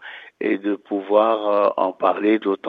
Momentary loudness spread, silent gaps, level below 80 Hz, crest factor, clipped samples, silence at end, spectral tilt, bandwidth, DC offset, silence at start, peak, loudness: 8 LU; none; -72 dBFS; 18 dB; under 0.1%; 0 s; -8 dB/octave; 4.7 kHz; under 0.1%; 0 s; -2 dBFS; -20 LUFS